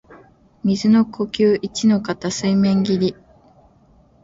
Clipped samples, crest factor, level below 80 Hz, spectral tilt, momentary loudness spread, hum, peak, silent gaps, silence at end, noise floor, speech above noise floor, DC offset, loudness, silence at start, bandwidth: under 0.1%; 14 dB; -54 dBFS; -6 dB/octave; 7 LU; none; -4 dBFS; none; 1.1 s; -53 dBFS; 36 dB; under 0.1%; -18 LUFS; 0.1 s; 7.8 kHz